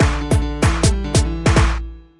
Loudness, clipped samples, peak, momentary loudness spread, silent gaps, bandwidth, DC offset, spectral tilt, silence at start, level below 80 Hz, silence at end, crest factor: -17 LUFS; under 0.1%; -2 dBFS; 4 LU; none; 11.5 kHz; under 0.1%; -5 dB/octave; 0 s; -22 dBFS; 0.2 s; 14 dB